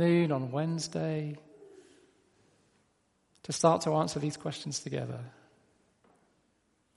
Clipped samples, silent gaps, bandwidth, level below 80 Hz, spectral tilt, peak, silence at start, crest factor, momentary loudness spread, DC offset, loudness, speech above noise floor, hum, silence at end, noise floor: under 0.1%; none; 11.5 kHz; -74 dBFS; -5.5 dB/octave; -10 dBFS; 0 s; 24 dB; 16 LU; under 0.1%; -31 LUFS; 43 dB; none; 1.65 s; -73 dBFS